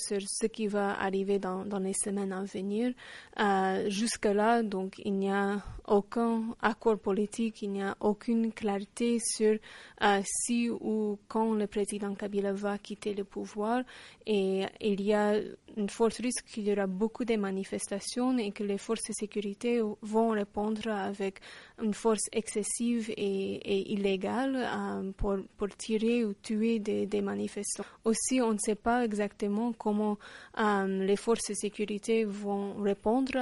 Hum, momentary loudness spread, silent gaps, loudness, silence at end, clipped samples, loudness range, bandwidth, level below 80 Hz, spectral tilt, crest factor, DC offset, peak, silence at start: none; 7 LU; none; -31 LUFS; 0 s; under 0.1%; 2 LU; 11.5 kHz; -56 dBFS; -4.5 dB/octave; 20 dB; under 0.1%; -10 dBFS; 0 s